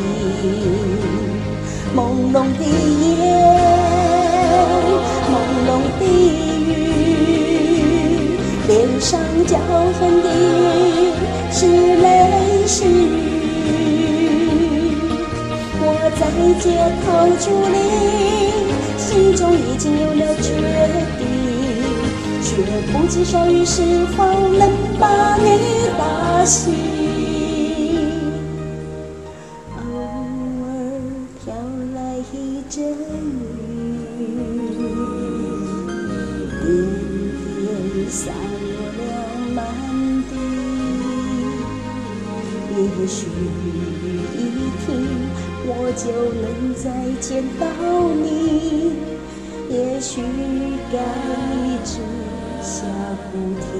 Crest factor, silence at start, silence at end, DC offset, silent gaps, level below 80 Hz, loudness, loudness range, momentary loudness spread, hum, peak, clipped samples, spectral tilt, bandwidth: 16 dB; 0 s; 0 s; 0.2%; none; -34 dBFS; -18 LUFS; 10 LU; 12 LU; none; 0 dBFS; under 0.1%; -5.5 dB/octave; 11.5 kHz